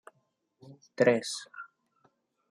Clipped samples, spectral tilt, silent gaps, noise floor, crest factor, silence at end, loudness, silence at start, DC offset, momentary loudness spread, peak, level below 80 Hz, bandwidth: under 0.1%; -4.5 dB/octave; none; -76 dBFS; 22 dB; 0.85 s; -28 LUFS; 0.7 s; under 0.1%; 24 LU; -12 dBFS; -84 dBFS; 14 kHz